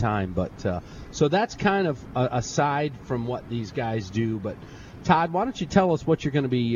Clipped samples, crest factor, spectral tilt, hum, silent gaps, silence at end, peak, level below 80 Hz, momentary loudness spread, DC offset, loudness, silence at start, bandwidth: under 0.1%; 22 dB; -6 dB/octave; none; none; 0 s; -4 dBFS; -48 dBFS; 10 LU; under 0.1%; -25 LUFS; 0 s; 7.4 kHz